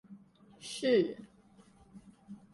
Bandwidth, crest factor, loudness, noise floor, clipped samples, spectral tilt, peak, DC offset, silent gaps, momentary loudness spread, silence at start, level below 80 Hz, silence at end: 11.5 kHz; 20 dB; -32 LUFS; -62 dBFS; under 0.1%; -4.5 dB/octave; -18 dBFS; under 0.1%; none; 24 LU; 0.1 s; -74 dBFS; 0.15 s